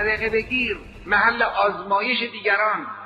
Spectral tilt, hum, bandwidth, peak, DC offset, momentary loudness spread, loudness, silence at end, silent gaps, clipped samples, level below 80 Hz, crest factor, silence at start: -5.5 dB/octave; none; 9.2 kHz; -6 dBFS; under 0.1%; 4 LU; -21 LUFS; 0 s; none; under 0.1%; -46 dBFS; 16 dB; 0 s